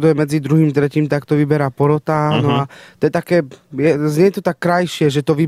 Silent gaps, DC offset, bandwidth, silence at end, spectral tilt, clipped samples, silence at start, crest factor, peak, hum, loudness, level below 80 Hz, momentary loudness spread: none; under 0.1%; 14.5 kHz; 0 s; -7 dB/octave; under 0.1%; 0 s; 14 dB; -2 dBFS; none; -16 LUFS; -54 dBFS; 4 LU